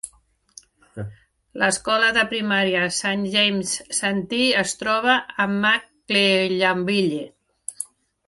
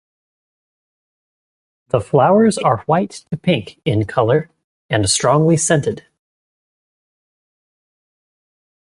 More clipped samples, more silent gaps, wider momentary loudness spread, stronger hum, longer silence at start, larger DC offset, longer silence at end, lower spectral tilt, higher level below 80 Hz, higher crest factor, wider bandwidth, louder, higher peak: neither; second, none vs 4.64-4.89 s; first, 18 LU vs 9 LU; neither; second, 0.05 s vs 1.95 s; neither; second, 0.45 s vs 2.85 s; second, -3 dB/octave vs -5 dB/octave; second, -60 dBFS vs -48 dBFS; about the same, 18 dB vs 18 dB; about the same, 11.5 kHz vs 11.5 kHz; second, -20 LUFS vs -16 LUFS; about the same, -4 dBFS vs -2 dBFS